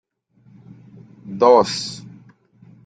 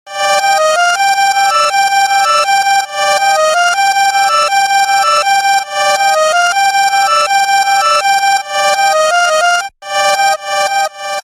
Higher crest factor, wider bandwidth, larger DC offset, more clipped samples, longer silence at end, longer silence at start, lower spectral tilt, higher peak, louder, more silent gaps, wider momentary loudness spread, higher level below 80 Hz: first, 20 dB vs 10 dB; second, 9.4 kHz vs 16 kHz; neither; neither; first, 0.75 s vs 0 s; first, 1.25 s vs 0.05 s; first, -4.5 dB/octave vs 2 dB/octave; about the same, -2 dBFS vs 0 dBFS; second, -17 LUFS vs -10 LUFS; neither; first, 22 LU vs 3 LU; second, -64 dBFS vs -58 dBFS